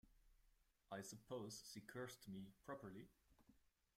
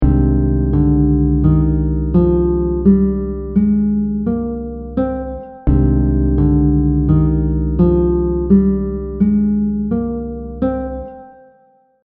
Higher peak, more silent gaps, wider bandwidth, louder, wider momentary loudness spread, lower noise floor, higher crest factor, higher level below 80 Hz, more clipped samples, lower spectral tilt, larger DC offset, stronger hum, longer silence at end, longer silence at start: second, -38 dBFS vs 0 dBFS; neither; first, 16 kHz vs 2.4 kHz; second, -56 LUFS vs -16 LUFS; second, 6 LU vs 9 LU; first, -79 dBFS vs -53 dBFS; about the same, 18 dB vs 14 dB; second, -80 dBFS vs -22 dBFS; neither; second, -4.5 dB/octave vs -12.5 dB/octave; neither; neither; second, 0.35 s vs 0.75 s; about the same, 0.05 s vs 0 s